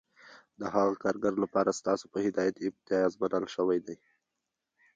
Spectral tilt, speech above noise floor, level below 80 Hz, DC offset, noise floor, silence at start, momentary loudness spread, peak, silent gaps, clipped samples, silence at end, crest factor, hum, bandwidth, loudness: -5.5 dB/octave; 56 dB; -70 dBFS; under 0.1%; -86 dBFS; 0.6 s; 6 LU; -14 dBFS; none; under 0.1%; 1 s; 18 dB; none; 9.2 kHz; -30 LUFS